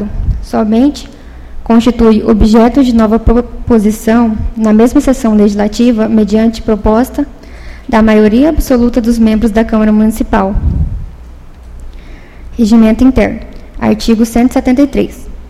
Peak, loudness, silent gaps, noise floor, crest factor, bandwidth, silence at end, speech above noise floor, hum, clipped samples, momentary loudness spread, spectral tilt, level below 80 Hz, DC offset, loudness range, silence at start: 0 dBFS; -9 LUFS; none; -30 dBFS; 10 dB; 14 kHz; 0 s; 22 dB; none; 0.4%; 10 LU; -7 dB/octave; -20 dBFS; 0.5%; 4 LU; 0 s